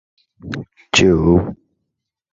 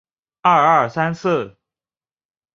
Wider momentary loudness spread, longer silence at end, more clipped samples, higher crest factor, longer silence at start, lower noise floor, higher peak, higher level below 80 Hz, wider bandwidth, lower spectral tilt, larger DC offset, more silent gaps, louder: first, 18 LU vs 9 LU; second, 0.8 s vs 1.05 s; neither; about the same, 18 dB vs 18 dB; about the same, 0.45 s vs 0.45 s; second, -77 dBFS vs under -90 dBFS; about the same, 0 dBFS vs -2 dBFS; first, -34 dBFS vs -60 dBFS; about the same, 8 kHz vs 7.6 kHz; about the same, -5 dB/octave vs -6 dB/octave; neither; neither; first, -14 LUFS vs -17 LUFS